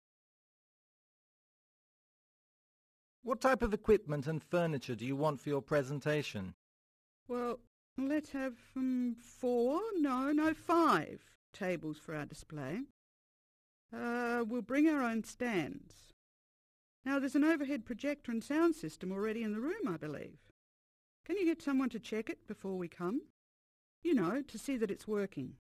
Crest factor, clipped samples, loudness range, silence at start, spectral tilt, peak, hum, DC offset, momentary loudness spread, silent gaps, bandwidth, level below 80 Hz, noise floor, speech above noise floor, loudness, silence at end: 20 dB; under 0.1%; 5 LU; 3.25 s; -6.5 dB/octave; -18 dBFS; none; under 0.1%; 13 LU; 6.54-7.26 s, 7.67-7.96 s, 11.35-11.53 s, 12.90-13.89 s, 16.13-17.03 s, 20.51-21.24 s, 23.30-24.02 s; 14 kHz; -64 dBFS; under -90 dBFS; over 55 dB; -36 LUFS; 0.2 s